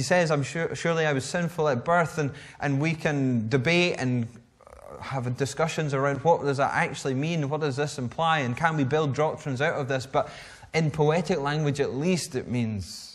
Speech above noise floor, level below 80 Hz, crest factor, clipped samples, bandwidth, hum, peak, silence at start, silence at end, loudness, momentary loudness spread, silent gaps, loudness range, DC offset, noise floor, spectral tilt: 22 dB; -58 dBFS; 18 dB; under 0.1%; 13 kHz; none; -8 dBFS; 0 s; 0 s; -26 LUFS; 8 LU; none; 2 LU; under 0.1%; -48 dBFS; -5.5 dB/octave